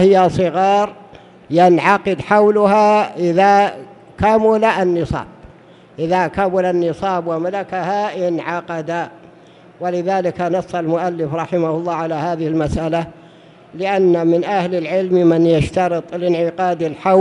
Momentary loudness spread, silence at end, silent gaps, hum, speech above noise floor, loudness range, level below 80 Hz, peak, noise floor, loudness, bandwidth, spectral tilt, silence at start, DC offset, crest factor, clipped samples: 10 LU; 0 s; none; none; 28 dB; 7 LU; -42 dBFS; 0 dBFS; -44 dBFS; -16 LUFS; 11 kHz; -7 dB/octave; 0 s; under 0.1%; 16 dB; under 0.1%